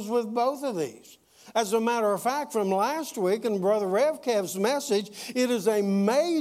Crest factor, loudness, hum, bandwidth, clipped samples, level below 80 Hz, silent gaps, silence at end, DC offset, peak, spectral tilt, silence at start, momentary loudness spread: 16 dB; -26 LUFS; none; 16 kHz; under 0.1%; -78 dBFS; none; 0 s; under 0.1%; -10 dBFS; -4.5 dB/octave; 0 s; 6 LU